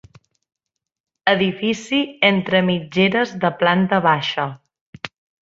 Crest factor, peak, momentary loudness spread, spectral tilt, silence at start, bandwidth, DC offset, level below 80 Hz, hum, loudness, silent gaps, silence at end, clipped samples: 20 dB; -2 dBFS; 12 LU; -6 dB/octave; 1.25 s; 7.8 kHz; under 0.1%; -60 dBFS; none; -18 LUFS; 4.81-4.93 s; 0.35 s; under 0.1%